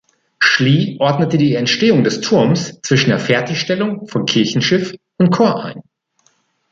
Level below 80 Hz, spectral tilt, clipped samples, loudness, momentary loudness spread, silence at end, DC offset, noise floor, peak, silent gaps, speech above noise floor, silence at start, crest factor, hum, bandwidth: -56 dBFS; -5.5 dB/octave; under 0.1%; -15 LUFS; 6 LU; 0.9 s; under 0.1%; -60 dBFS; 0 dBFS; none; 45 dB; 0.4 s; 14 dB; none; 7.8 kHz